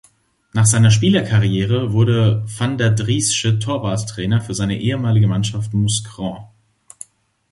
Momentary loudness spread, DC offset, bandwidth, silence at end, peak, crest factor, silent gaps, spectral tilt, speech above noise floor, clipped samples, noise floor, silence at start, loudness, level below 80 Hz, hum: 14 LU; under 0.1%; 11.5 kHz; 1.05 s; -2 dBFS; 16 dB; none; -5 dB/octave; 40 dB; under 0.1%; -56 dBFS; 0.55 s; -17 LUFS; -44 dBFS; none